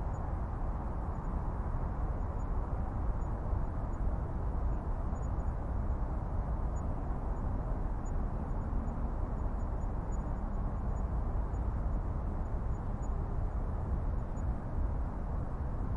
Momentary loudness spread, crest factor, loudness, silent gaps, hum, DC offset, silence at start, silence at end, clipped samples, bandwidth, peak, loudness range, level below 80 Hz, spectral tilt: 2 LU; 14 dB; -38 LUFS; none; none; under 0.1%; 0 s; 0 s; under 0.1%; 7.4 kHz; -20 dBFS; 1 LU; -36 dBFS; -9.5 dB/octave